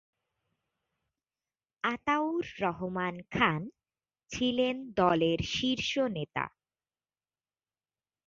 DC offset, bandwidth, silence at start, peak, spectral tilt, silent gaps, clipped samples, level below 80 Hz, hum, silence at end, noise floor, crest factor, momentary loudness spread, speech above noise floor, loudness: under 0.1%; 7.6 kHz; 1.85 s; -10 dBFS; -5 dB/octave; none; under 0.1%; -58 dBFS; none; 1.8 s; under -90 dBFS; 24 dB; 9 LU; over 60 dB; -31 LUFS